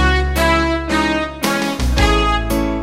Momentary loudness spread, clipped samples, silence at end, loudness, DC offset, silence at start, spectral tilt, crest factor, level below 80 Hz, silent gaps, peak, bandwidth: 4 LU; under 0.1%; 0 s; -16 LUFS; under 0.1%; 0 s; -5 dB/octave; 14 dB; -20 dBFS; none; -2 dBFS; 16 kHz